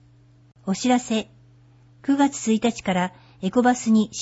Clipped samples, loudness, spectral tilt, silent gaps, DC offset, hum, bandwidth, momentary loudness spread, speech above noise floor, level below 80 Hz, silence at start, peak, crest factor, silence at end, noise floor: under 0.1%; -22 LUFS; -5 dB/octave; none; under 0.1%; none; 8 kHz; 11 LU; 32 dB; -60 dBFS; 0.65 s; -6 dBFS; 16 dB; 0 s; -53 dBFS